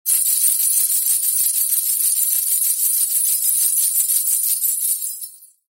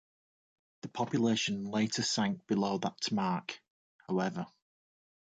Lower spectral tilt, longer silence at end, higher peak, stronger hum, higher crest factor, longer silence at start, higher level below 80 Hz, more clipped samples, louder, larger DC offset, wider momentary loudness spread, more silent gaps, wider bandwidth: second, 8.5 dB/octave vs -4.5 dB/octave; second, 0.25 s vs 0.8 s; first, -4 dBFS vs -18 dBFS; neither; about the same, 16 dB vs 18 dB; second, 0.05 s vs 0.85 s; second, under -90 dBFS vs -72 dBFS; neither; first, -15 LUFS vs -33 LUFS; neither; second, 4 LU vs 14 LU; second, none vs 3.70-3.99 s; first, 16.5 kHz vs 9.4 kHz